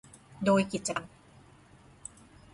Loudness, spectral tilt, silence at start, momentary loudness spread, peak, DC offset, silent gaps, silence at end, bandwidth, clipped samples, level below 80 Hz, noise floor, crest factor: -30 LUFS; -5 dB/octave; 0.4 s; 21 LU; -14 dBFS; under 0.1%; none; 1.45 s; 11.5 kHz; under 0.1%; -64 dBFS; -57 dBFS; 20 dB